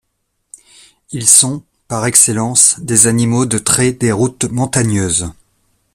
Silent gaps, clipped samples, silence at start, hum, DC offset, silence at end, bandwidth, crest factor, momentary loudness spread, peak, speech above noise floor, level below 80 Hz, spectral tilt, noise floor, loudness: none; 0.2%; 1.1 s; none; under 0.1%; 0.6 s; over 20 kHz; 14 dB; 11 LU; 0 dBFS; 55 dB; -44 dBFS; -3.5 dB/octave; -68 dBFS; -11 LUFS